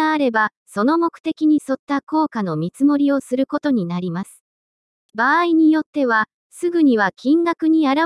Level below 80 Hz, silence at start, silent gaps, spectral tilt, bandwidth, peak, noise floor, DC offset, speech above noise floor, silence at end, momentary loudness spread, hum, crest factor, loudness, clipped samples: -70 dBFS; 0 s; 0.57-0.66 s, 1.20-1.24 s, 1.79-1.87 s, 2.03-2.07 s, 4.40-5.09 s, 5.86-5.93 s, 6.34-6.50 s; -6.5 dB/octave; 12 kHz; -4 dBFS; under -90 dBFS; under 0.1%; over 72 dB; 0 s; 9 LU; none; 14 dB; -18 LUFS; under 0.1%